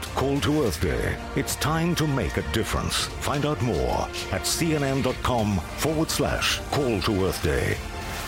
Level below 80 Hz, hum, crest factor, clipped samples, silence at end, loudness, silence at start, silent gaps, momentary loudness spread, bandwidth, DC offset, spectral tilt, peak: -38 dBFS; none; 14 dB; under 0.1%; 0 s; -25 LUFS; 0 s; none; 4 LU; 16.5 kHz; under 0.1%; -4.5 dB/octave; -10 dBFS